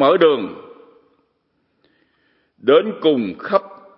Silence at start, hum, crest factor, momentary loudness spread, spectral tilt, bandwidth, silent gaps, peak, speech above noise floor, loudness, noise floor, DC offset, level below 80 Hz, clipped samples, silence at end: 0 s; none; 18 dB; 10 LU; -10 dB/octave; 5.6 kHz; none; 0 dBFS; 52 dB; -17 LUFS; -67 dBFS; under 0.1%; -72 dBFS; under 0.1%; 0.3 s